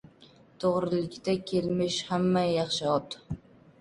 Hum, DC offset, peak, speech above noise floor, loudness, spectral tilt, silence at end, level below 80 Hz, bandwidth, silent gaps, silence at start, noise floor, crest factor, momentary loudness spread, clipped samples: none; under 0.1%; -12 dBFS; 28 dB; -29 LUFS; -5.5 dB/octave; 0.45 s; -58 dBFS; 11.5 kHz; none; 0.2 s; -57 dBFS; 18 dB; 13 LU; under 0.1%